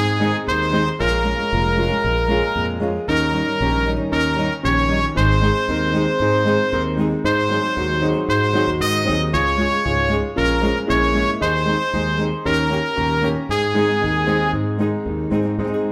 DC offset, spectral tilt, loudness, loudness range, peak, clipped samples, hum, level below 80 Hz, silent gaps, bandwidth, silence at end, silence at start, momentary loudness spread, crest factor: under 0.1%; -6 dB/octave; -19 LUFS; 1 LU; -4 dBFS; under 0.1%; none; -28 dBFS; none; 16 kHz; 0 s; 0 s; 3 LU; 16 dB